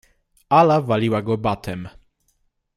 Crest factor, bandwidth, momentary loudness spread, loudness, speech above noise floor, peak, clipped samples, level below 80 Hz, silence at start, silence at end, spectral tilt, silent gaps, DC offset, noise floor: 18 dB; 15 kHz; 17 LU; -19 LUFS; 49 dB; -2 dBFS; under 0.1%; -52 dBFS; 0.5 s; 0.85 s; -7.5 dB/octave; none; under 0.1%; -67 dBFS